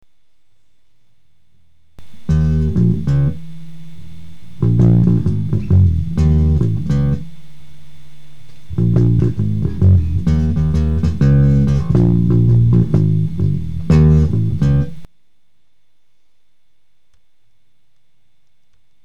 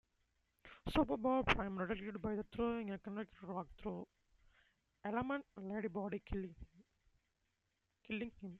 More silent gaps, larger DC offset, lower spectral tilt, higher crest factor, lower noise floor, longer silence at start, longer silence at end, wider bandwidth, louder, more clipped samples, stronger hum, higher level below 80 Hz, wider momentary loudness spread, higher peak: neither; first, 6% vs under 0.1%; first, -10 dB/octave vs -7 dB/octave; second, 12 dB vs 26 dB; second, -70 dBFS vs -86 dBFS; second, 0 s vs 0.65 s; about the same, 0 s vs 0 s; second, 7.2 kHz vs 11.5 kHz; first, -15 LUFS vs -42 LUFS; neither; neither; first, -26 dBFS vs -58 dBFS; second, 8 LU vs 14 LU; first, -4 dBFS vs -16 dBFS